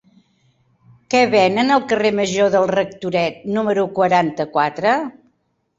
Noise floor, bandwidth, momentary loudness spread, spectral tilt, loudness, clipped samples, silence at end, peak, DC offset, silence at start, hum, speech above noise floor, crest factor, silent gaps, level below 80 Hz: -66 dBFS; 8 kHz; 6 LU; -5 dB/octave; -17 LUFS; under 0.1%; 0.65 s; -2 dBFS; under 0.1%; 1.1 s; none; 50 dB; 16 dB; none; -60 dBFS